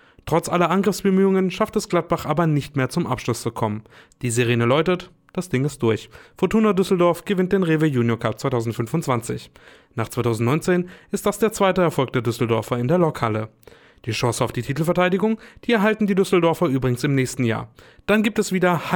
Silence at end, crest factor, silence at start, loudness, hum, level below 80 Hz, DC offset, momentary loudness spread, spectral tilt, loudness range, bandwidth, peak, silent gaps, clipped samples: 0 s; 16 dB; 0.25 s; -21 LUFS; none; -50 dBFS; under 0.1%; 9 LU; -6 dB/octave; 3 LU; 19.5 kHz; -6 dBFS; none; under 0.1%